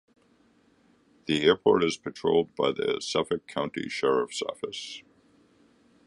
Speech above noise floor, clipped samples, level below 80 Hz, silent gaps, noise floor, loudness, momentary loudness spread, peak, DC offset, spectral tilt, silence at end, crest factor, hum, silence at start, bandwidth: 37 dB; under 0.1%; -64 dBFS; none; -63 dBFS; -27 LUFS; 13 LU; -6 dBFS; under 0.1%; -4.5 dB/octave; 1.05 s; 22 dB; none; 1.3 s; 11 kHz